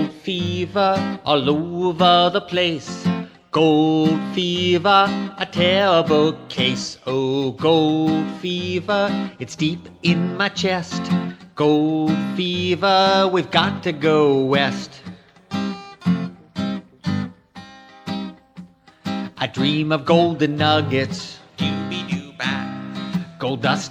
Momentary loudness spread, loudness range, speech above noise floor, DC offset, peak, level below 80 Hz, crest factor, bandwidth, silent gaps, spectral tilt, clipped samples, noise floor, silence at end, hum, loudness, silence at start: 13 LU; 9 LU; 24 dB; under 0.1%; -2 dBFS; -58 dBFS; 18 dB; 10 kHz; none; -5.5 dB/octave; under 0.1%; -42 dBFS; 0 s; none; -20 LUFS; 0 s